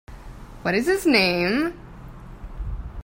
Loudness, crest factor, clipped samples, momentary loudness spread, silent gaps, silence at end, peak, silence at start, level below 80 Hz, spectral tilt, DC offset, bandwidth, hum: -21 LUFS; 20 dB; under 0.1%; 25 LU; none; 0 s; -6 dBFS; 0.1 s; -38 dBFS; -5 dB/octave; under 0.1%; 16 kHz; none